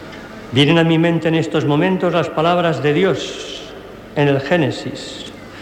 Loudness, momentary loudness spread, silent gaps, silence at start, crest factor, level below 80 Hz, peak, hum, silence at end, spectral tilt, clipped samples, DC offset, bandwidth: -16 LUFS; 18 LU; none; 0 s; 14 dB; -50 dBFS; -2 dBFS; none; 0 s; -6.5 dB/octave; under 0.1%; under 0.1%; 10.5 kHz